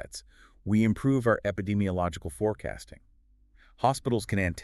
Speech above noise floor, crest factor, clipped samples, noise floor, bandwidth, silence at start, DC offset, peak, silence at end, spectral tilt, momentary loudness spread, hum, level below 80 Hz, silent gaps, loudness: 33 dB; 20 dB; under 0.1%; -61 dBFS; 13 kHz; 0 s; under 0.1%; -10 dBFS; 0 s; -6.5 dB/octave; 17 LU; none; -52 dBFS; none; -28 LUFS